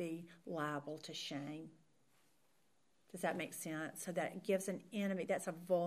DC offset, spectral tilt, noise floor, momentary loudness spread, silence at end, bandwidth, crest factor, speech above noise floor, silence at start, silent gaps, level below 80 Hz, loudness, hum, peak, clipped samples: under 0.1%; -4.5 dB/octave; -79 dBFS; 10 LU; 0 s; 15.5 kHz; 18 dB; 37 dB; 0 s; none; -90 dBFS; -43 LUFS; none; -24 dBFS; under 0.1%